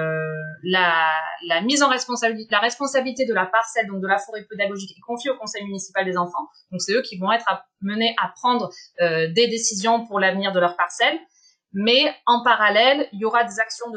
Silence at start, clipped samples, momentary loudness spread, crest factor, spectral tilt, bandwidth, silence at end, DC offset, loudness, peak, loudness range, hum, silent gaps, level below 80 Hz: 0 s; under 0.1%; 12 LU; 18 dB; -3 dB/octave; 9.6 kHz; 0 s; under 0.1%; -21 LUFS; -2 dBFS; 6 LU; none; none; -76 dBFS